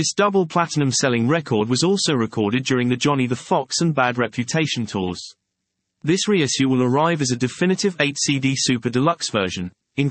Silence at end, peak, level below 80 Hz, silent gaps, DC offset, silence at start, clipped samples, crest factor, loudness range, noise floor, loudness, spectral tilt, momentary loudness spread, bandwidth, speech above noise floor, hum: 0 s; -4 dBFS; -62 dBFS; none; under 0.1%; 0 s; under 0.1%; 16 dB; 3 LU; -78 dBFS; -20 LUFS; -4.5 dB/octave; 6 LU; 8.8 kHz; 58 dB; none